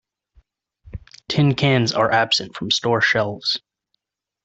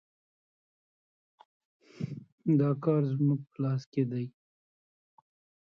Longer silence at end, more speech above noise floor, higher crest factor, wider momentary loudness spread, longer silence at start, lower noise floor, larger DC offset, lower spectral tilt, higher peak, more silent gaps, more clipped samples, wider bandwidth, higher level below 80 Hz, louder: second, 0.85 s vs 1.4 s; second, 56 dB vs over 61 dB; about the same, 18 dB vs 18 dB; first, 21 LU vs 13 LU; second, 0.85 s vs 2 s; second, -74 dBFS vs under -90 dBFS; neither; second, -4.5 dB/octave vs -10.5 dB/octave; first, -4 dBFS vs -16 dBFS; second, none vs 2.32-2.38 s, 3.86-3.92 s; neither; first, 8 kHz vs 6.4 kHz; first, -52 dBFS vs -76 dBFS; first, -19 LUFS vs -31 LUFS